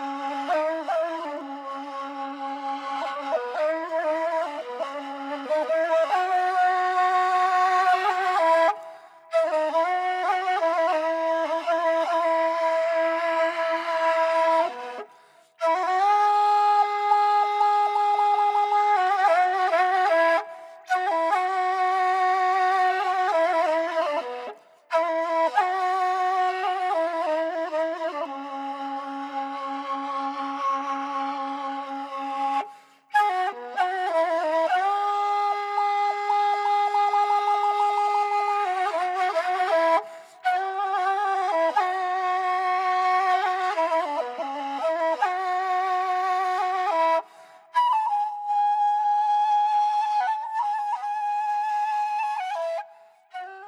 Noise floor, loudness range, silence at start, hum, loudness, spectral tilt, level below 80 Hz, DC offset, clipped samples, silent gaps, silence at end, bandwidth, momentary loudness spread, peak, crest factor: -55 dBFS; 7 LU; 0 s; none; -24 LUFS; -1.5 dB/octave; under -90 dBFS; under 0.1%; under 0.1%; none; 0 s; 12.5 kHz; 10 LU; -8 dBFS; 14 dB